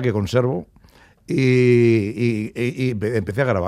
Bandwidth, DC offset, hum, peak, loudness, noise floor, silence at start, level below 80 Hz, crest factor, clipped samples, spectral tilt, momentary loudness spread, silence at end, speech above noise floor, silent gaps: 12.5 kHz; under 0.1%; none; -4 dBFS; -19 LUFS; -51 dBFS; 0 s; -52 dBFS; 14 dB; under 0.1%; -7.5 dB/octave; 10 LU; 0 s; 32 dB; none